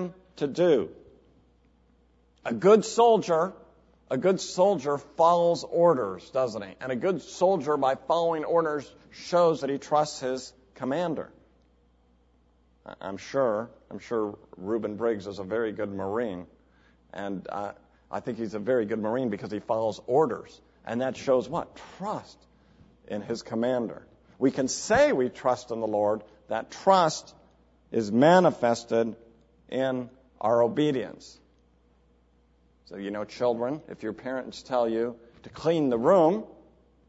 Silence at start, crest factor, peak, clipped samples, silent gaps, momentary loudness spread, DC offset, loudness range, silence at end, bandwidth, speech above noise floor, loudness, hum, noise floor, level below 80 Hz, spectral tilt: 0 s; 20 dB; -6 dBFS; under 0.1%; none; 16 LU; under 0.1%; 8 LU; 0.55 s; 8 kHz; 37 dB; -27 LUFS; none; -63 dBFS; -64 dBFS; -5.5 dB/octave